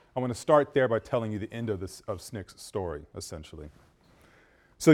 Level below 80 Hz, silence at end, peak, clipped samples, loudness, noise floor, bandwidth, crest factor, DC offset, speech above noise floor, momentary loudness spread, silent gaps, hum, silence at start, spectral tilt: -56 dBFS; 0 s; -6 dBFS; under 0.1%; -30 LUFS; -61 dBFS; 17.5 kHz; 22 dB; under 0.1%; 31 dB; 18 LU; none; none; 0.15 s; -6 dB/octave